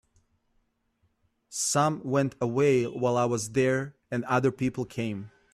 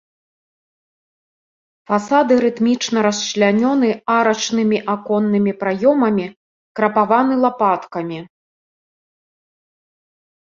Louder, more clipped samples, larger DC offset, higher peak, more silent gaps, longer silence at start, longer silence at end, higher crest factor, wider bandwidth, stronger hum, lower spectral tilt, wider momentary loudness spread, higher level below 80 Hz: second, -27 LUFS vs -17 LUFS; neither; neither; second, -12 dBFS vs -2 dBFS; second, none vs 6.36-6.75 s; second, 1.5 s vs 1.9 s; second, 0.25 s vs 2.25 s; about the same, 16 dB vs 16 dB; first, 14 kHz vs 7.6 kHz; neither; about the same, -5 dB/octave vs -5 dB/octave; about the same, 10 LU vs 8 LU; about the same, -64 dBFS vs -64 dBFS